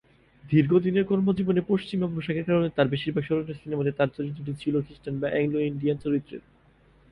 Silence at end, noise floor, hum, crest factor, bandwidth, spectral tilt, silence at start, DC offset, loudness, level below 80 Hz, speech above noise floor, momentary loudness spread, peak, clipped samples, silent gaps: 0.7 s; -59 dBFS; none; 18 dB; 10 kHz; -9 dB/octave; 0.45 s; under 0.1%; -26 LUFS; -56 dBFS; 33 dB; 9 LU; -8 dBFS; under 0.1%; none